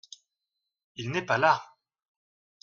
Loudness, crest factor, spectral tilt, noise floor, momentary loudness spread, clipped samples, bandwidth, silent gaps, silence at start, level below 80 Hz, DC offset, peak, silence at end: -26 LUFS; 24 dB; -5 dB/octave; -86 dBFS; 16 LU; under 0.1%; 7.4 kHz; none; 1 s; -72 dBFS; under 0.1%; -8 dBFS; 1 s